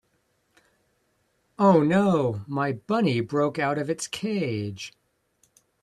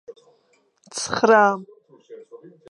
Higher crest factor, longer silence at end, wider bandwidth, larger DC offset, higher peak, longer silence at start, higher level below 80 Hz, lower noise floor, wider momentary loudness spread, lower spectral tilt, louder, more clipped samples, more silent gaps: about the same, 18 dB vs 20 dB; first, 0.95 s vs 0.35 s; about the same, 12.5 kHz vs 11.5 kHz; neither; second, -8 dBFS vs -2 dBFS; first, 1.6 s vs 0.1 s; about the same, -66 dBFS vs -66 dBFS; first, -70 dBFS vs -63 dBFS; second, 11 LU vs 19 LU; first, -6.5 dB/octave vs -3.5 dB/octave; second, -24 LUFS vs -19 LUFS; neither; neither